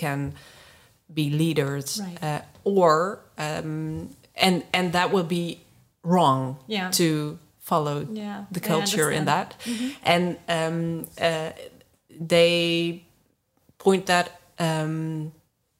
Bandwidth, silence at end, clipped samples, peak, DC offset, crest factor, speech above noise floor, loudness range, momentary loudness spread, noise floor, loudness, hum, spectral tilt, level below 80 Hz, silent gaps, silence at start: 16 kHz; 0.5 s; under 0.1%; -2 dBFS; under 0.1%; 24 dB; 43 dB; 2 LU; 14 LU; -67 dBFS; -24 LUFS; none; -4.5 dB/octave; -64 dBFS; none; 0 s